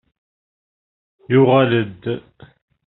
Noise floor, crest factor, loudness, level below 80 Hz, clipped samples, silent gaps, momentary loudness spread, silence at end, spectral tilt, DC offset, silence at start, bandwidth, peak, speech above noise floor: under -90 dBFS; 18 dB; -17 LUFS; -60 dBFS; under 0.1%; none; 14 LU; 0.7 s; -6 dB/octave; under 0.1%; 1.3 s; 4.1 kHz; -2 dBFS; over 74 dB